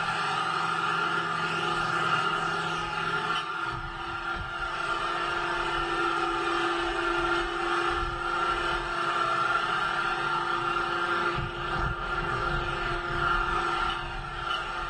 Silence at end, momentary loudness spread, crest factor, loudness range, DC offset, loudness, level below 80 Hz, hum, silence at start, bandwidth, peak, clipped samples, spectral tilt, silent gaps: 0 s; 5 LU; 14 dB; 2 LU; under 0.1%; -28 LUFS; -44 dBFS; none; 0 s; 10.5 kHz; -14 dBFS; under 0.1%; -4 dB/octave; none